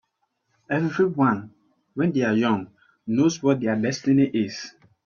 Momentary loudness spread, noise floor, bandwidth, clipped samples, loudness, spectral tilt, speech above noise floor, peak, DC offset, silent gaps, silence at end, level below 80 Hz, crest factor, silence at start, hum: 16 LU; -74 dBFS; 7.2 kHz; under 0.1%; -23 LUFS; -6.5 dB/octave; 52 dB; -8 dBFS; under 0.1%; none; 0.35 s; -64 dBFS; 16 dB; 0.7 s; none